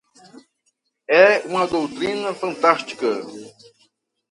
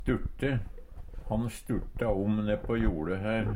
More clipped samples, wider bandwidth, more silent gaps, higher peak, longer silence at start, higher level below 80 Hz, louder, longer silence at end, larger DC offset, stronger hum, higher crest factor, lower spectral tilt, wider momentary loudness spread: neither; second, 11.5 kHz vs 16 kHz; neither; first, 0 dBFS vs -16 dBFS; first, 1.1 s vs 0 s; second, -64 dBFS vs -38 dBFS; first, -19 LUFS vs -32 LUFS; first, 0.85 s vs 0 s; neither; neither; first, 22 dB vs 16 dB; second, -4 dB/octave vs -7.5 dB/octave; second, 13 LU vs 17 LU